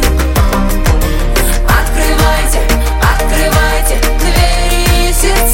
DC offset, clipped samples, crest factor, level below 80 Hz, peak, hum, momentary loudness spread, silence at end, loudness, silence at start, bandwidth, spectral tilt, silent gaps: under 0.1%; under 0.1%; 10 dB; -12 dBFS; 0 dBFS; none; 2 LU; 0 s; -12 LUFS; 0 s; 17.5 kHz; -4 dB/octave; none